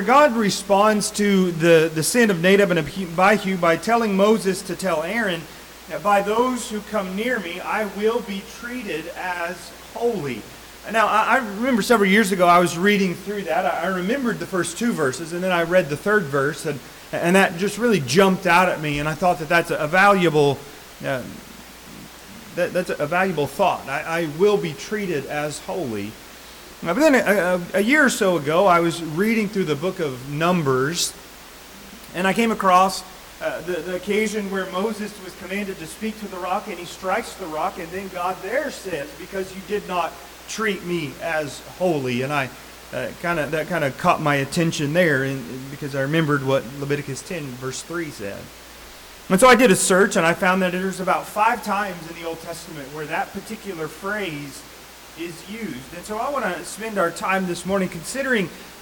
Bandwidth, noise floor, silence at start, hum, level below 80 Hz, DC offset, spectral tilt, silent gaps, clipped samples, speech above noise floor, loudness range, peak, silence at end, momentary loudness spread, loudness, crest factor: 19 kHz; -42 dBFS; 0 s; none; -52 dBFS; under 0.1%; -4.5 dB/octave; none; under 0.1%; 21 dB; 9 LU; -4 dBFS; 0 s; 17 LU; -21 LUFS; 16 dB